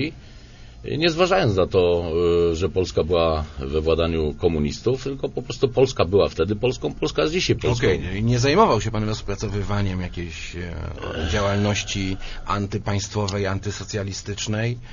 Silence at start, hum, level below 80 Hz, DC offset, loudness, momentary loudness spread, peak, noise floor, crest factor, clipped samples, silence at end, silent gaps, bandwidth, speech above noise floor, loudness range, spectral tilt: 0 s; none; -36 dBFS; under 0.1%; -22 LUFS; 10 LU; -2 dBFS; -42 dBFS; 20 dB; under 0.1%; 0 s; none; 7.4 kHz; 20 dB; 5 LU; -5.5 dB/octave